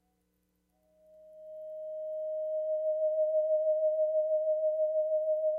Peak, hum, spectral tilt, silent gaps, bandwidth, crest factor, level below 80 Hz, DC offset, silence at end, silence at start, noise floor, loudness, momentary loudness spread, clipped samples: -22 dBFS; 60 Hz at -80 dBFS; -6.5 dB/octave; none; 0.8 kHz; 10 dB; -82 dBFS; under 0.1%; 0 s; 1.2 s; -76 dBFS; -31 LUFS; 13 LU; under 0.1%